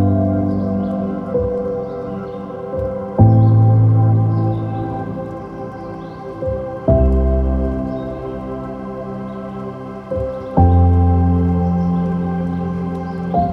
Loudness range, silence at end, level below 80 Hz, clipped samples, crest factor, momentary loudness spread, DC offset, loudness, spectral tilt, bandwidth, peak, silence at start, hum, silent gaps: 5 LU; 0 s; -26 dBFS; under 0.1%; 16 dB; 15 LU; under 0.1%; -18 LUFS; -11.5 dB/octave; 3.9 kHz; 0 dBFS; 0 s; none; none